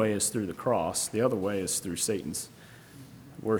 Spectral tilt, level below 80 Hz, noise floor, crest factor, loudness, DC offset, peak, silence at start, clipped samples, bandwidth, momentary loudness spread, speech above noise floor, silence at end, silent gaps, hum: -4 dB/octave; -62 dBFS; -50 dBFS; 18 dB; -29 LUFS; under 0.1%; -12 dBFS; 0 s; under 0.1%; over 20 kHz; 21 LU; 20 dB; 0 s; none; none